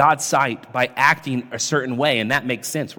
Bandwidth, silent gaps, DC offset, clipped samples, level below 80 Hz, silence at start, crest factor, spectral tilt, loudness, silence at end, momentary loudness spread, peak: 18 kHz; none; under 0.1%; under 0.1%; -64 dBFS; 0 s; 18 dB; -3.5 dB/octave; -20 LUFS; 0.05 s; 7 LU; -2 dBFS